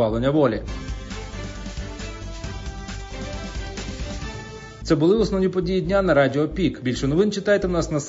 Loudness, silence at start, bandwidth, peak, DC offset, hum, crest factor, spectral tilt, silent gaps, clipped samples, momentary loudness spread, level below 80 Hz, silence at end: -23 LUFS; 0 s; 7.8 kHz; -4 dBFS; under 0.1%; none; 18 dB; -6 dB/octave; none; under 0.1%; 15 LU; -36 dBFS; 0 s